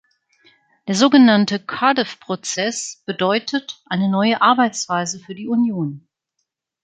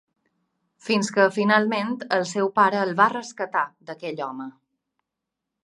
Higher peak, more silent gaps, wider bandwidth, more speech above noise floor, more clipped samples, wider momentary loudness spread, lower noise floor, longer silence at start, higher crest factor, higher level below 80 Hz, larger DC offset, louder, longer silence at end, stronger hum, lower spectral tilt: about the same, -2 dBFS vs -2 dBFS; neither; second, 9.4 kHz vs 11.5 kHz; second, 58 dB vs 62 dB; neither; about the same, 14 LU vs 14 LU; second, -76 dBFS vs -84 dBFS; about the same, 0.85 s vs 0.85 s; about the same, 18 dB vs 22 dB; first, -66 dBFS vs -78 dBFS; neither; first, -18 LUFS vs -22 LUFS; second, 0.85 s vs 1.15 s; neither; about the same, -4 dB/octave vs -4.5 dB/octave